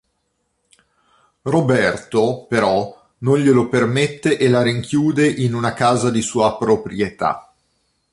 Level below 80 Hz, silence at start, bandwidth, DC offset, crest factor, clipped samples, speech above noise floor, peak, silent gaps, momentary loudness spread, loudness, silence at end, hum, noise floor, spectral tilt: -52 dBFS; 1.45 s; 11.5 kHz; under 0.1%; 16 dB; under 0.1%; 53 dB; -2 dBFS; none; 7 LU; -18 LUFS; 0.7 s; none; -70 dBFS; -6 dB/octave